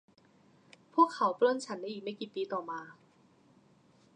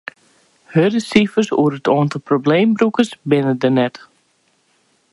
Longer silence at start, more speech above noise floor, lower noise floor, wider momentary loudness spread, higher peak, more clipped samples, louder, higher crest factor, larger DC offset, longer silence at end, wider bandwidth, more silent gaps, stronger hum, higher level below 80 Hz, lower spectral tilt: first, 0.95 s vs 0.7 s; second, 33 dB vs 46 dB; first, -65 dBFS vs -61 dBFS; first, 14 LU vs 4 LU; second, -12 dBFS vs 0 dBFS; neither; second, -32 LUFS vs -16 LUFS; about the same, 22 dB vs 18 dB; neither; about the same, 1.25 s vs 1.15 s; second, 9.8 kHz vs 11.5 kHz; neither; neither; second, -88 dBFS vs -60 dBFS; second, -4.5 dB/octave vs -6.5 dB/octave